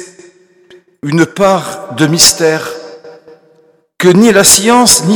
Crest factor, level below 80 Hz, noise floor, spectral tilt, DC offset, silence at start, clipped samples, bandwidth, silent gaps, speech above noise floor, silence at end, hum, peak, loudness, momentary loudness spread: 10 dB; -44 dBFS; -49 dBFS; -3 dB/octave; under 0.1%; 0 s; 0.9%; over 20 kHz; none; 41 dB; 0 s; none; 0 dBFS; -8 LUFS; 17 LU